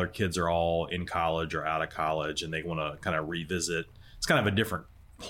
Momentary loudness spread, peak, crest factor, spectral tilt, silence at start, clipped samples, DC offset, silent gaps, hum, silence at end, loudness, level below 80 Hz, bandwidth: 7 LU; -12 dBFS; 18 dB; -4.5 dB/octave; 0 s; under 0.1%; under 0.1%; none; none; 0 s; -30 LUFS; -50 dBFS; 16.5 kHz